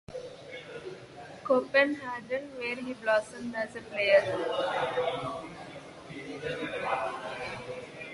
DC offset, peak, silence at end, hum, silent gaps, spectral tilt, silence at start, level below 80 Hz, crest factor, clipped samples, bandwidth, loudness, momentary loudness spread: under 0.1%; -10 dBFS; 0 s; none; none; -4.5 dB/octave; 0.1 s; -66 dBFS; 22 dB; under 0.1%; 11.5 kHz; -30 LUFS; 19 LU